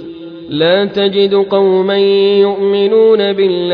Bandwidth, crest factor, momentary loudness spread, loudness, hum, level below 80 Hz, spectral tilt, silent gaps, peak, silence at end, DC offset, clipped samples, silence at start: 5 kHz; 10 dB; 5 LU; -11 LUFS; none; -54 dBFS; -8 dB/octave; none; 0 dBFS; 0 s; under 0.1%; under 0.1%; 0 s